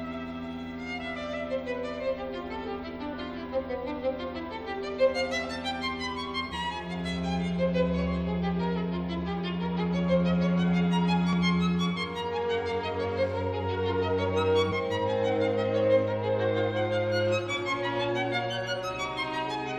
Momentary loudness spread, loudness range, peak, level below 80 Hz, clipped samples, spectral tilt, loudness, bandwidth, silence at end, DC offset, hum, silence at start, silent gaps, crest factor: 10 LU; 7 LU; -14 dBFS; -48 dBFS; under 0.1%; -6.5 dB/octave; -29 LUFS; 9.2 kHz; 0 s; under 0.1%; none; 0 s; none; 16 dB